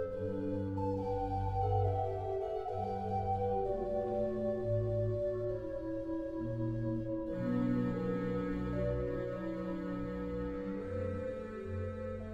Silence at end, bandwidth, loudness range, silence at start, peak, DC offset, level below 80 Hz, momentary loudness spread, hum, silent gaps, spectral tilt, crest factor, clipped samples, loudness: 0 s; 7.6 kHz; 3 LU; 0 s; -22 dBFS; under 0.1%; -50 dBFS; 6 LU; none; none; -10 dB/octave; 14 dB; under 0.1%; -37 LUFS